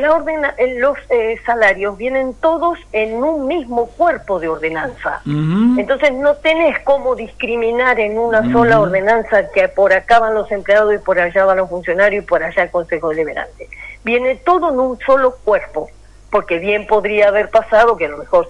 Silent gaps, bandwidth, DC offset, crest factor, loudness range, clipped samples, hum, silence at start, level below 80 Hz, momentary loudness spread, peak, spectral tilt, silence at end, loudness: none; 10.5 kHz; under 0.1%; 14 dB; 4 LU; under 0.1%; none; 0 s; -42 dBFS; 8 LU; -2 dBFS; -6.5 dB/octave; 0 s; -15 LUFS